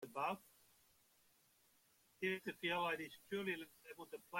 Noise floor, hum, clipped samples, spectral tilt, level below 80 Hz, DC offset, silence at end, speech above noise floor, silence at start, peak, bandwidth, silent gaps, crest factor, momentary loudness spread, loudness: -75 dBFS; none; under 0.1%; -4.5 dB/octave; -86 dBFS; under 0.1%; 0 s; 30 dB; 0 s; -30 dBFS; 16.5 kHz; none; 18 dB; 14 LU; -44 LUFS